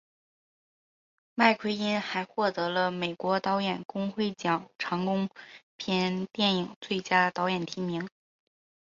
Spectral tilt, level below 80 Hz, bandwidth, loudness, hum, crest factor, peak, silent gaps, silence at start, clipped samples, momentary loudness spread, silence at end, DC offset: -5.5 dB/octave; -72 dBFS; 7.6 kHz; -29 LUFS; none; 24 dB; -8 dBFS; 3.85-3.89 s, 5.63-5.78 s, 6.76-6.81 s; 1.35 s; under 0.1%; 9 LU; 0.85 s; under 0.1%